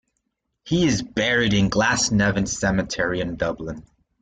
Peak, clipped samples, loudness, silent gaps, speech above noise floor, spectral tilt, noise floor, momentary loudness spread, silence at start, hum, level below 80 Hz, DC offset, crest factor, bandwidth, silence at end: -6 dBFS; under 0.1%; -21 LUFS; none; 55 dB; -4 dB/octave; -76 dBFS; 8 LU; 0.65 s; none; -42 dBFS; under 0.1%; 16 dB; 9.4 kHz; 0.4 s